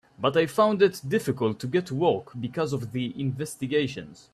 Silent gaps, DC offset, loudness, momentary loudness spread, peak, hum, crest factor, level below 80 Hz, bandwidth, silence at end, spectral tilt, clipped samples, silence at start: none; under 0.1%; -26 LUFS; 10 LU; -8 dBFS; none; 18 dB; -64 dBFS; 14 kHz; 0.2 s; -6 dB/octave; under 0.1%; 0.2 s